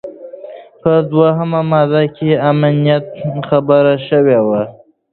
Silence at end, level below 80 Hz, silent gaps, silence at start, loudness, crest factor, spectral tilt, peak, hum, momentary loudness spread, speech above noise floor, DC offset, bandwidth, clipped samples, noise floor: 0.4 s; -54 dBFS; none; 0.05 s; -13 LUFS; 14 dB; -11.5 dB/octave; 0 dBFS; none; 16 LU; 20 dB; under 0.1%; 4.4 kHz; under 0.1%; -32 dBFS